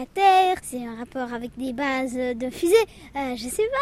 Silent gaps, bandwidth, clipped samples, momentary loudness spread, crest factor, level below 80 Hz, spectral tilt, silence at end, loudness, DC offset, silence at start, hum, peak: none; 16 kHz; under 0.1%; 14 LU; 18 dB; -52 dBFS; -3.5 dB/octave; 0 s; -24 LUFS; under 0.1%; 0 s; none; -6 dBFS